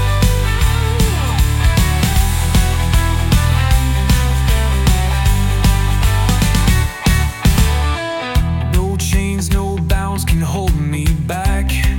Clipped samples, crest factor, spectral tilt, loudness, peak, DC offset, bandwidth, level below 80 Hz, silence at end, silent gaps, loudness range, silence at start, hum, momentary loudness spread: under 0.1%; 12 dB; -5 dB/octave; -16 LUFS; -2 dBFS; under 0.1%; 17 kHz; -16 dBFS; 0 s; none; 2 LU; 0 s; none; 3 LU